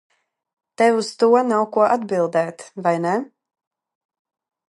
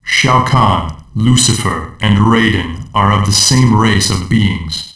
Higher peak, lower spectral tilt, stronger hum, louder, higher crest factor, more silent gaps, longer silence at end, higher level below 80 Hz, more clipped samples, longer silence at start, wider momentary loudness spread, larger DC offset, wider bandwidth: about the same, -2 dBFS vs 0 dBFS; first, -5.5 dB/octave vs -4 dB/octave; neither; second, -19 LUFS vs -11 LUFS; first, 18 dB vs 10 dB; neither; first, 1.45 s vs 0.05 s; second, -76 dBFS vs -30 dBFS; neither; first, 0.8 s vs 0.05 s; about the same, 8 LU vs 9 LU; neither; about the same, 11.5 kHz vs 11 kHz